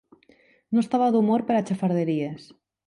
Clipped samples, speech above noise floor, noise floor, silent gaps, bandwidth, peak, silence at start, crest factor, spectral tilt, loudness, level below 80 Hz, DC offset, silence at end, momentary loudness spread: under 0.1%; 36 dB; -59 dBFS; none; 11 kHz; -12 dBFS; 0.7 s; 14 dB; -8 dB/octave; -24 LUFS; -70 dBFS; under 0.1%; 0.45 s; 9 LU